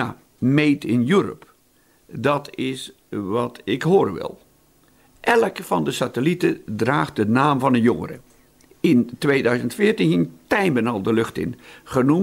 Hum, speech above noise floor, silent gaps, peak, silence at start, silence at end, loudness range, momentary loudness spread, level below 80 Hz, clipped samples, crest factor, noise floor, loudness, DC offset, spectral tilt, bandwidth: none; 39 dB; none; -4 dBFS; 0 s; 0 s; 4 LU; 12 LU; -56 dBFS; under 0.1%; 16 dB; -59 dBFS; -21 LUFS; under 0.1%; -6.5 dB/octave; 16 kHz